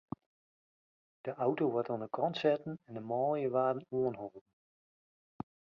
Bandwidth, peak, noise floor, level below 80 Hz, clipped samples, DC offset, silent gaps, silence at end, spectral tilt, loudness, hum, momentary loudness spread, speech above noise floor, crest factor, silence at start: 6.8 kHz; -16 dBFS; under -90 dBFS; -76 dBFS; under 0.1%; under 0.1%; none; 1.35 s; -5.5 dB/octave; -35 LUFS; none; 17 LU; over 56 dB; 20 dB; 1.25 s